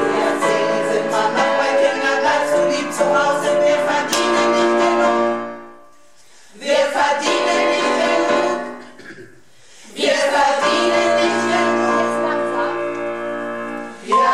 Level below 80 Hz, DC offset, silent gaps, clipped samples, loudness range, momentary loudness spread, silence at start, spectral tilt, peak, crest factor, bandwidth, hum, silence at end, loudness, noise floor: -62 dBFS; 0.6%; none; under 0.1%; 3 LU; 10 LU; 0 s; -3 dB/octave; -4 dBFS; 14 dB; 16 kHz; none; 0 s; -17 LUFS; -50 dBFS